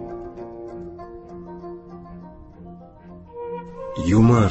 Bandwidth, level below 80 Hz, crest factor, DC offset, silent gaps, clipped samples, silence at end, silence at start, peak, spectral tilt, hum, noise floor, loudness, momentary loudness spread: 8.2 kHz; -42 dBFS; 20 dB; under 0.1%; none; under 0.1%; 0 s; 0 s; -6 dBFS; -8 dB/octave; none; -43 dBFS; -23 LUFS; 26 LU